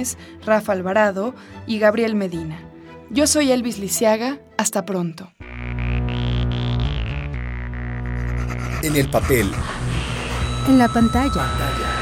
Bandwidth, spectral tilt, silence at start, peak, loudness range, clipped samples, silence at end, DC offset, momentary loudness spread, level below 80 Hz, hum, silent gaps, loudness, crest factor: 18 kHz; -5 dB/octave; 0 s; 0 dBFS; 5 LU; under 0.1%; 0 s; under 0.1%; 12 LU; -30 dBFS; none; none; -21 LUFS; 20 dB